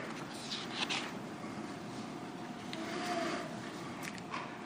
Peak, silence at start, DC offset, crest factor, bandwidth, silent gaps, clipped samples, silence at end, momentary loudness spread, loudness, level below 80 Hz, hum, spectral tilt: -16 dBFS; 0 s; under 0.1%; 24 dB; 15.5 kHz; none; under 0.1%; 0 s; 8 LU; -40 LUFS; -76 dBFS; none; -3.5 dB/octave